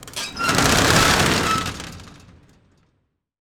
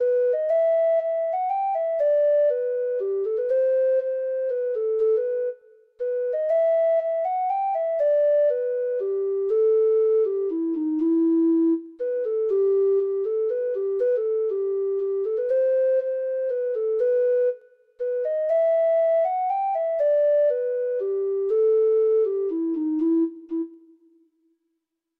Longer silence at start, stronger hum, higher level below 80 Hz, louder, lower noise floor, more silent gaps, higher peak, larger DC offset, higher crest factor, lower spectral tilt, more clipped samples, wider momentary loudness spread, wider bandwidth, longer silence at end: about the same, 0 s vs 0 s; neither; first, -38 dBFS vs -76 dBFS; first, -17 LUFS vs -23 LUFS; second, -70 dBFS vs -79 dBFS; neither; first, 0 dBFS vs -14 dBFS; neither; first, 20 dB vs 8 dB; second, -3 dB/octave vs -7 dB/octave; neither; first, 16 LU vs 6 LU; first, over 20 kHz vs 3.5 kHz; about the same, 1.3 s vs 1.4 s